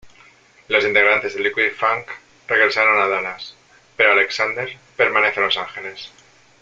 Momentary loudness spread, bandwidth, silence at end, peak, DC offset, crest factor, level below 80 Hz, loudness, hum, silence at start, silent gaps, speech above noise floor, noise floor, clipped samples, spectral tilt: 19 LU; 7.8 kHz; 0.55 s; 0 dBFS; under 0.1%; 20 dB; -62 dBFS; -17 LUFS; none; 0.05 s; none; 32 dB; -50 dBFS; under 0.1%; -3 dB/octave